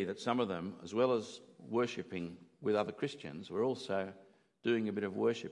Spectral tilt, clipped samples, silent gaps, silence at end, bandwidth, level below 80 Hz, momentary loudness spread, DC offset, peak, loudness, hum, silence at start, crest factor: -6 dB/octave; under 0.1%; none; 0 s; 11 kHz; -82 dBFS; 10 LU; under 0.1%; -18 dBFS; -37 LUFS; none; 0 s; 18 dB